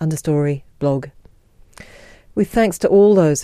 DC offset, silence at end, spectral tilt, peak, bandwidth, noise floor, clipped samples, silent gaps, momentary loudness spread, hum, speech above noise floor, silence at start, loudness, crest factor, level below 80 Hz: under 0.1%; 0 s; -6.5 dB/octave; -2 dBFS; 15.5 kHz; -49 dBFS; under 0.1%; none; 13 LU; none; 33 dB; 0 s; -17 LUFS; 16 dB; -44 dBFS